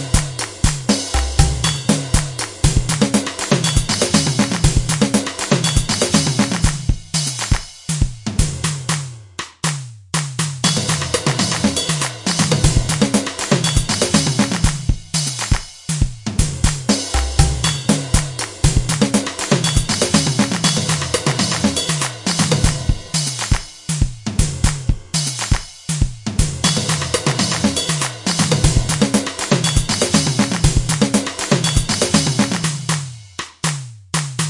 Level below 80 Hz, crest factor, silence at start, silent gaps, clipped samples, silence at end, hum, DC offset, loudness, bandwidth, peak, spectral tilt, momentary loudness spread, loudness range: -26 dBFS; 18 dB; 0 s; none; under 0.1%; 0 s; none; under 0.1%; -18 LUFS; 11.5 kHz; 0 dBFS; -4 dB/octave; 7 LU; 4 LU